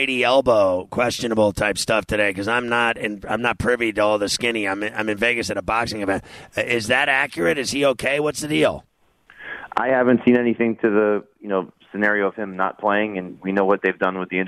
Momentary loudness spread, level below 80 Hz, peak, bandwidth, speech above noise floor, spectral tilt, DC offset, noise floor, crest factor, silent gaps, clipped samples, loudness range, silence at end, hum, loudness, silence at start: 9 LU; -50 dBFS; -4 dBFS; 14.5 kHz; 32 dB; -4 dB/octave; under 0.1%; -53 dBFS; 16 dB; none; under 0.1%; 1 LU; 0 s; none; -20 LUFS; 0 s